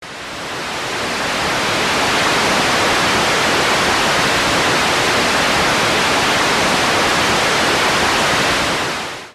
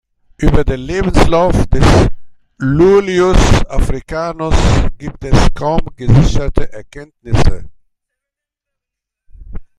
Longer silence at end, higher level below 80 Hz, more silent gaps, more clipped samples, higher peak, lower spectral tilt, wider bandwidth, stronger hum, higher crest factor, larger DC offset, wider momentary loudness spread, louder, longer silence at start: about the same, 0.05 s vs 0.15 s; second, -42 dBFS vs -18 dBFS; neither; neither; second, -4 dBFS vs 0 dBFS; second, -2 dB/octave vs -6.5 dB/octave; first, 14 kHz vs 11.5 kHz; neither; about the same, 12 dB vs 12 dB; neither; second, 7 LU vs 11 LU; about the same, -14 LUFS vs -13 LUFS; second, 0 s vs 0.4 s